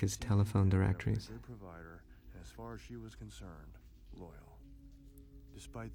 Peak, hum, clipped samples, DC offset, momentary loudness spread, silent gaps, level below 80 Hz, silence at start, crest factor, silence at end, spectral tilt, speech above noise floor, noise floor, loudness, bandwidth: -20 dBFS; none; under 0.1%; under 0.1%; 27 LU; none; -54 dBFS; 0 s; 18 dB; 0 s; -6.5 dB/octave; 20 dB; -56 dBFS; -35 LUFS; 15.5 kHz